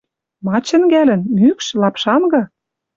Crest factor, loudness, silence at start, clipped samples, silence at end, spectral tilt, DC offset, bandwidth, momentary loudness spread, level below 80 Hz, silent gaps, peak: 12 dB; -14 LUFS; 0.45 s; under 0.1%; 0.5 s; -5.5 dB/octave; under 0.1%; 7.8 kHz; 7 LU; -58 dBFS; none; -2 dBFS